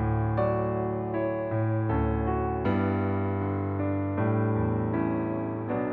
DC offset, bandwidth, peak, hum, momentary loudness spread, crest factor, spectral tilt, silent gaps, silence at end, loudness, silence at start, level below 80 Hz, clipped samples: under 0.1%; 4.1 kHz; -14 dBFS; none; 3 LU; 14 dB; -9 dB/octave; none; 0 s; -28 LUFS; 0 s; -42 dBFS; under 0.1%